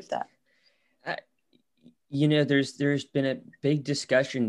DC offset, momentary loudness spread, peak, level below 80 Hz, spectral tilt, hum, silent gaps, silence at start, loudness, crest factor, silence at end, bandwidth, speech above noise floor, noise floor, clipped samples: under 0.1%; 13 LU; -10 dBFS; -74 dBFS; -6 dB/octave; none; none; 0.1 s; -27 LUFS; 18 dB; 0 s; 11 kHz; 43 dB; -69 dBFS; under 0.1%